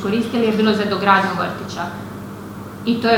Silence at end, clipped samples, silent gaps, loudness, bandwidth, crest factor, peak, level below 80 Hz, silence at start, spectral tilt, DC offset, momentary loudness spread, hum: 0 s; under 0.1%; none; -19 LUFS; 17 kHz; 18 dB; 0 dBFS; -52 dBFS; 0 s; -6 dB/octave; under 0.1%; 17 LU; none